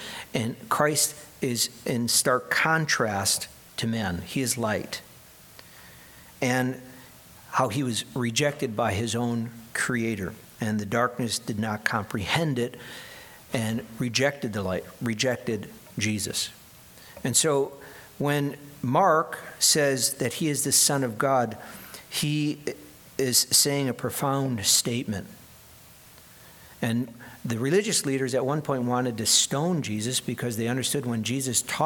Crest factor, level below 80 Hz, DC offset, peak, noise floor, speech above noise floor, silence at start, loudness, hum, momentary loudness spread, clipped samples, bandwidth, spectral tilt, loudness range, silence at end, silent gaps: 22 dB; -60 dBFS; under 0.1%; -4 dBFS; -51 dBFS; 25 dB; 0 s; -25 LUFS; none; 13 LU; under 0.1%; 19 kHz; -3 dB/octave; 6 LU; 0 s; none